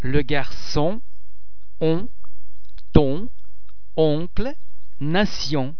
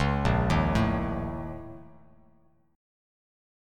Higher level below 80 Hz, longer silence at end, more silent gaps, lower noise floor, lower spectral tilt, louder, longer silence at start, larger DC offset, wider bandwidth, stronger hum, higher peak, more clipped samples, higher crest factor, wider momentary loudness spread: about the same, -34 dBFS vs -38 dBFS; second, 0 s vs 1.9 s; neither; second, -41 dBFS vs -64 dBFS; about the same, -6.5 dB/octave vs -7 dB/octave; first, -23 LUFS vs -27 LUFS; about the same, 0 s vs 0 s; first, 10% vs under 0.1%; second, 5.4 kHz vs 13 kHz; neither; first, 0 dBFS vs -12 dBFS; neither; first, 24 dB vs 18 dB; second, 13 LU vs 19 LU